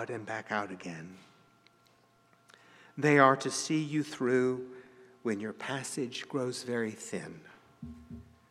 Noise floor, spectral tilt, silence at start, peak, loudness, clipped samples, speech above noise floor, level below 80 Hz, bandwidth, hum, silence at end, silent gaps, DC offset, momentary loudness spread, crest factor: -66 dBFS; -4.5 dB/octave; 0 s; -8 dBFS; -31 LUFS; under 0.1%; 34 dB; -68 dBFS; 14 kHz; none; 0.3 s; none; under 0.1%; 24 LU; 26 dB